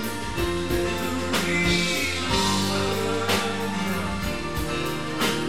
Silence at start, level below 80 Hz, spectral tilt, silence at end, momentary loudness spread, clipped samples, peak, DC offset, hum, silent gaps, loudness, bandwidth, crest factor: 0 s; -40 dBFS; -4 dB/octave; 0 s; 6 LU; under 0.1%; -10 dBFS; 1%; none; none; -24 LUFS; 17.5 kHz; 16 dB